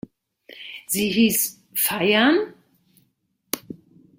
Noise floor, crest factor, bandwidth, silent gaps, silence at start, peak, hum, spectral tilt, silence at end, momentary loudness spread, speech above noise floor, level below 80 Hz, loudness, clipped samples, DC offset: -70 dBFS; 24 dB; 16.5 kHz; none; 0.5 s; 0 dBFS; none; -3 dB/octave; 0.45 s; 20 LU; 50 dB; -62 dBFS; -21 LUFS; under 0.1%; under 0.1%